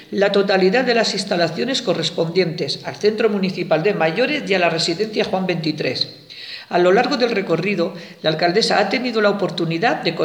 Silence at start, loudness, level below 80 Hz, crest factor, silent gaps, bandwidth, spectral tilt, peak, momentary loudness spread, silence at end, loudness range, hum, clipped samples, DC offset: 0 s; -18 LUFS; -66 dBFS; 16 dB; none; 14 kHz; -5 dB/octave; -2 dBFS; 7 LU; 0 s; 2 LU; none; under 0.1%; under 0.1%